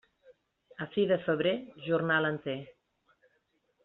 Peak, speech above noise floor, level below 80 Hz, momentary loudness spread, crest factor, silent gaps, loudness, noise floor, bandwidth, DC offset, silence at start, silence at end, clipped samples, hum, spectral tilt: -14 dBFS; 45 dB; -74 dBFS; 13 LU; 18 dB; none; -31 LUFS; -75 dBFS; 4.2 kHz; under 0.1%; 0.3 s; 1.15 s; under 0.1%; none; -4 dB/octave